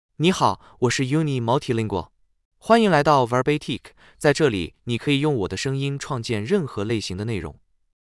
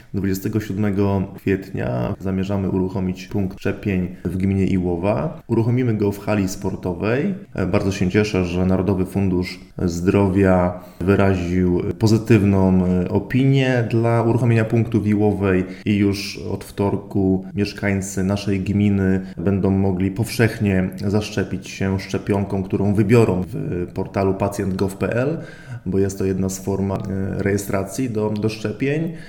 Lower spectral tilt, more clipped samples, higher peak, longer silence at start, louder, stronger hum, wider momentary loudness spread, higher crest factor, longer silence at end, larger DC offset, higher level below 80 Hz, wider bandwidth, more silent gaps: second, -5.5 dB/octave vs -7 dB/octave; neither; second, -4 dBFS vs 0 dBFS; about the same, 0.2 s vs 0.15 s; about the same, -22 LUFS vs -20 LUFS; neither; first, 11 LU vs 8 LU; about the same, 18 dB vs 20 dB; first, 0.6 s vs 0 s; neither; second, -52 dBFS vs -44 dBFS; second, 12 kHz vs 17 kHz; first, 2.45-2.51 s vs none